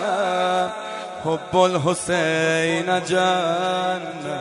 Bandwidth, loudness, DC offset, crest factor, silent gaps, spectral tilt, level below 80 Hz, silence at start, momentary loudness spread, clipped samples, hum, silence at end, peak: 11.5 kHz; -21 LUFS; under 0.1%; 18 dB; none; -4 dB/octave; -58 dBFS; 0 s; 9 LU; under 0.1%; none; 0 s; -4 dBFS